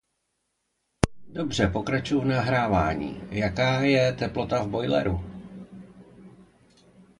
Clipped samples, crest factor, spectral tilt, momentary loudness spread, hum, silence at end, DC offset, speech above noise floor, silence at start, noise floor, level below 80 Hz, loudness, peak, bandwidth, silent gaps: under 0.1%; 26 dB; -6 dB/octave; 18 LU; none; 0.8 s; under 0.1%; 52 dB; 1.05 s; -77 dBFS; -44 dBFS; -25 LUFS; 0 dBFS; 11.5 kHz; none